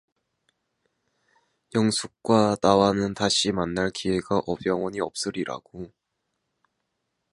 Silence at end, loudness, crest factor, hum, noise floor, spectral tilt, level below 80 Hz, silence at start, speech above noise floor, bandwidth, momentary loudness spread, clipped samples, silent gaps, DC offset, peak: 1.45 s; -24 LUFS; 24 dB; none; -79 dBFS; -4.5 dB/octave; -56 dBFS; 1.75 s; 55 dB; 11.5 kHz; 13 LU; under 0.1%; none; under 0.1%; -2 dBFS